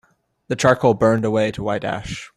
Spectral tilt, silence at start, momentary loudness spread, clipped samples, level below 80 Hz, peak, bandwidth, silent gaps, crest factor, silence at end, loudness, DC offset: -6 dB/octave; 0.5 s; 11 LU; under 0.1%; -48 dBFS; -2 dBFS; 13.5 kHz; none; 18 dB; 0.1 s; -19 LUFS; under 0.1%